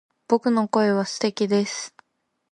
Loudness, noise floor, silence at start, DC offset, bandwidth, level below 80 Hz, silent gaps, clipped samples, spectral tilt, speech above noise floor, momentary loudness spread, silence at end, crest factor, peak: -23 LUFS; -74 dBFS; 0.3 s; under 0.1%; 11 kHz; -72 dBFS; none; under 0.1%; -5 dB/octave; 53 dB; 9 LU; 0.65 s; 18 dB; -4 dBFS